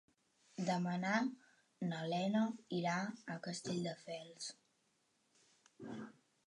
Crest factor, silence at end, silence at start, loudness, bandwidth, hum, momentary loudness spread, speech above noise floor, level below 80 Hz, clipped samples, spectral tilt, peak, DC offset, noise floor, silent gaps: 20 dB; 0.35 s; 0.55 s; -41 LUFS; 11 kHz; none; 15 LU; 39 dB; -86 dBFS; under 0.1%; -5.5 dB/octave; -22 dBFS; under 0.1%; -79 dBFS; none